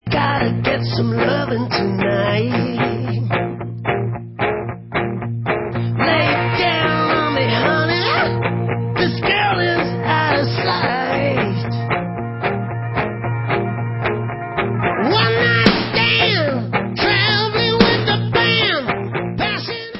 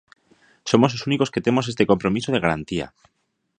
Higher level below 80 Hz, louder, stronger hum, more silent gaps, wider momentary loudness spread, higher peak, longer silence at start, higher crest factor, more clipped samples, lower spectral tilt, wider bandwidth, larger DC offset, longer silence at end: first, -42 dBFS vs -52 dBFS; first, -18 LUFS vs -21 LUFS; neither; neither; about the same, 8 LU vs 10 LU; about the same, 0 dBFS vs 0 dBFS; second, 0.05 s vs 0.65 s; about the same, 18 dB vs 22 dB; neither; first, -8 dB/octave vs -6 dB/octave; second, 5.8 kHz vs 9.8 kHz; neither; second, 0 s vs 0.7 s